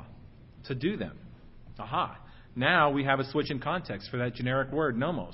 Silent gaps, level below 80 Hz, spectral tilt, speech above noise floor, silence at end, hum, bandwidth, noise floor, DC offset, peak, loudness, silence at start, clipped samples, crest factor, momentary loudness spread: none; -54 dBFS; -10 dB/octave; 21 dB; 0 s; none; 5.8 kHz; -50 dBFS; under 0.1%; -10 dBFS; -30 LUFS; 0 s; under 0.1%; 22 dB; 16 LU